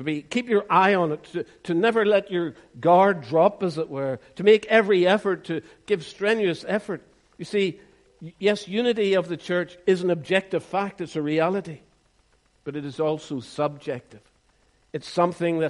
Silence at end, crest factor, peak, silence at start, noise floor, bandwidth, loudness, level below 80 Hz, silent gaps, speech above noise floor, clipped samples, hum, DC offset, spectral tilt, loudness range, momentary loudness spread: 0 s; 20 dB; -4 dBFS; 0 s; -63 dBFS; 11.5 kHz; -23 LUFS; -66 dBFS; none; 40 dB; under 0.1%; none; under 0.1%; -6 dB/octave; 8 LU; 15 LU